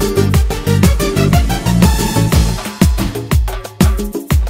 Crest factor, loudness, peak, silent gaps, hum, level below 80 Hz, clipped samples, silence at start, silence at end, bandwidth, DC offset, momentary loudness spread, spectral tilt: 12 dB; -14 LUFS; 0 dBFS; none; none; -18 dBFS; under 0.1%; 0 s; 0 s; 16.5 kHz; under 0.1%; 5 LU; -5.5 dB/octave